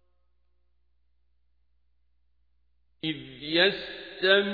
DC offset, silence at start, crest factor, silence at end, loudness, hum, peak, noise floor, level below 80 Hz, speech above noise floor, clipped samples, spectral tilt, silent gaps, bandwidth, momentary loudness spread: under 0.1%; 3.05 s; 24 dB; 0 s; -26 LUFS; 60 Hz at -70 dBFS; -8 dBFS; -73 dBFS; -66 dBFS; 48 dB; under 0.1%; -6 dB/octave; none; 5 kHz; 14 LU